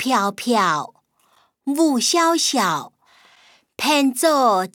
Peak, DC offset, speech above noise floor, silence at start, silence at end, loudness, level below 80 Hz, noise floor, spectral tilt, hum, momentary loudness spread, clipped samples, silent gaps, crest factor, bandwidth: -6 dBFS; under 0.1%; 42 dB; 0 s; 0.05 s; -18 LUFS; -74 dBFS; -61 dBFS; -2.5 dB/octave; none; 9 LU; under 0.1%; none; 16 dB; over 20 kHz